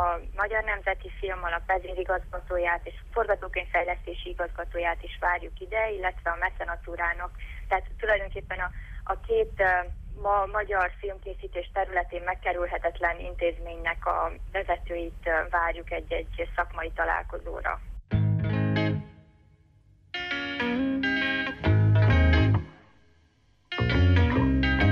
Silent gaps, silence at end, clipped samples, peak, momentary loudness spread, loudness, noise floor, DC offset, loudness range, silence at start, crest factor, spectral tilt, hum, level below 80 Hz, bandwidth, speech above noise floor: none; 0 s; under 0.1%; -12 dBFS; 11 LU; -28 LUFS; -63 dBFS; under 0.1%; 5 LU; 0 s; 16 dB; -8 dB/octave; none; -36 dBFS; 6.6 kHz; 34 dB